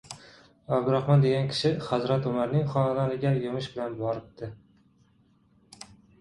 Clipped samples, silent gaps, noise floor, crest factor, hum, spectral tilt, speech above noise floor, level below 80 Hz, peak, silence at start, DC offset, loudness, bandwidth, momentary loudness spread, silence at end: under 0.1%; none; -63 dBFS; 18 dB; none; -7.5 dB/octave; 37 dB; -60 dBFS; -10 dBFS; 0.1 s; under 0.1%; -27 LUFS; 11.5 kHz; 22 LU; 0.35 s